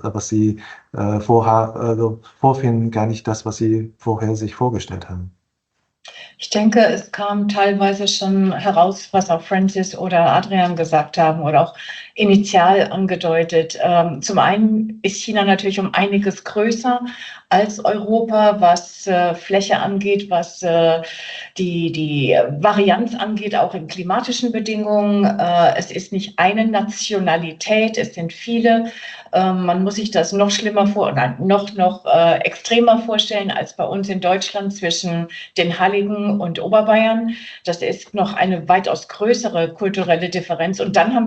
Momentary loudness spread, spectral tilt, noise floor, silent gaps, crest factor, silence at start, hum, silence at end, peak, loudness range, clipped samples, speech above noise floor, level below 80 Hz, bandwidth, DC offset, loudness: 9 LU; -5 dB/octave; -72 dBFS; none; 16 dB; 0.05 s; none; 0 s; -2 dBFS; 4 LU; under 0.1%; 55 dB; -60 dBFS; 8.6 kHz; under 0.1%; -17 LUFS